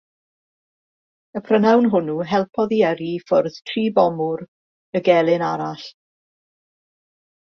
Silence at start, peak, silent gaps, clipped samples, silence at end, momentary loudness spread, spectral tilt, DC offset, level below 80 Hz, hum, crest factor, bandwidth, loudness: 1.35 s; -2 dBFS; 4.48-4.93 s; under 0.1%; 1.65 s; 14 LU; -7 dB/octave; under 0.1%; -66 dBFS; none; 18 dB; 6.8 kHz; -19 LUFS